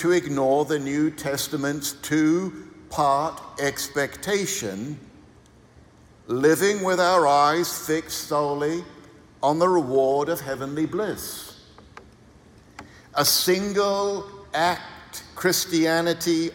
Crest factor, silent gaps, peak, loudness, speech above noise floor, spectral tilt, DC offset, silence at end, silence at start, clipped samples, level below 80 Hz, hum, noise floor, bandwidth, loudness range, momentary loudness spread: 18 dB; none; -6 dBFS; -23 LUFS; 29 dB; -4 dB/octave; under 0.1%; 0 s; 0 s; under 0.1%; -58 dBFS; none; -52 dBFS; 18 kHz; 5 LU; 13 LU